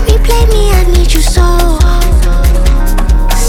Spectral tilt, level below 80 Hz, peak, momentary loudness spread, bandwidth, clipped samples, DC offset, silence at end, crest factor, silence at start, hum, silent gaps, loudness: -5 dB/octave; -6 dBFS; 0 dBFS; 3 LU; 18 kHz; 0.2%; under 0.1%; 0 s; 6 dB; 0 s; none; none; -10 LUFS